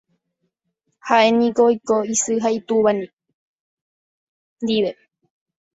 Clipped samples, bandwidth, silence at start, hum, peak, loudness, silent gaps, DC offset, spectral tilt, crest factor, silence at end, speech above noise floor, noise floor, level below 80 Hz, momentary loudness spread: under 0.1%; 8 kHz; 1.05 s; none; -2 dBFS; -19 LUFS; 3.13-3.17 s, 3.34-4.56 s; under 0.1%; -3.5 dB/octave; 20 dB; 0.8 s; 56 dB; -74 dBFS; -66 dBFS; 11 LU